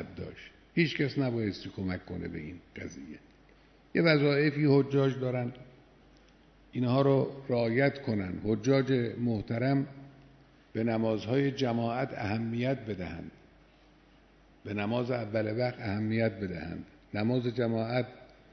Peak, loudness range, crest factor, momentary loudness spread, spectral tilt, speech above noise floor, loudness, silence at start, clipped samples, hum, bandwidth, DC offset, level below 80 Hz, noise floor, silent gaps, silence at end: -10 dBFS; 6 LU; 20 dB; 17 LU; -7.5 dB/octave; 30 dB; -30 LUFS; 0 s; under 0.1%; none; 6.4 kHz; under 0.1%; -60 dBFS; -60 dBFS; none; 0.25 s